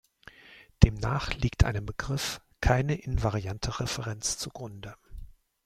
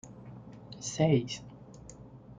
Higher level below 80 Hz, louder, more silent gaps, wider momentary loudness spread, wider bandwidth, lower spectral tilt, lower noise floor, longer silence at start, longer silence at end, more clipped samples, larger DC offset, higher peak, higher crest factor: first, -36 dBFS vs -60 dBFS; about the same, -29 LUFS vs -31 LUFS; neither; second, 17 LU vs 23 LU; first, 15.5 kHz vs 9.4 kHz; about the same, -5 dB/octave vs -5.5 dB/octave; first, -55 dBFS vs -50 dBFS; first, 0.5 s vs 0.05 s; first, 0.4 s vs 0.05 s; neither; neither; first, -2 dBFS vs -14 dBFS; first, 26 dB vs 20 dB